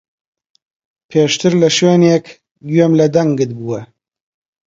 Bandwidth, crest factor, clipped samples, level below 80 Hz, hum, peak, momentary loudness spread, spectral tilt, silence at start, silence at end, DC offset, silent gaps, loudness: 7.8 kHz; 14 dB; under 0.1%; -58 dBFS; none; 0 dBFS; 13 LU; -5.5 dB/octave; 1.1 s; 0.8 s; under 0.1%; 2.51-2.55 s; -13 LUFS